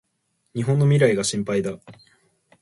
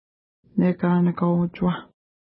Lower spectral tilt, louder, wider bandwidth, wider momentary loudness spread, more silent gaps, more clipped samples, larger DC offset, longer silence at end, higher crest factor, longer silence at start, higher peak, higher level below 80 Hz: second, -6 dB/octave vs -13 dB/octave; about the same, -21 LUFS vs -23 LUFS; first, 11.5 kHz vs 4.1 kHz; first, 15 LU vs 7 LU; neither; neither; neither; first, 0.7 s vs 0.45 s; about the same, 18 dB vs 14 dB; about the same, 0.55 s vs 0.55 s; first, -4 dBFS vs -8 dBFS; second, -60 dBFS vs -54 dBFS